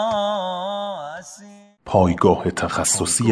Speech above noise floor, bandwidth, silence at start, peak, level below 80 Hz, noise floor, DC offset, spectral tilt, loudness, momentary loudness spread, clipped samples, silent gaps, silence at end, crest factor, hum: 27 dB; 11 kHz; 0 s; -2 dBFS; -46 dBFS; -45 dBFS; under 0.1%; -4 dB/octave; -20 LUFS; 15 LU; under 0.1%; none; 0 s; 20 dB; none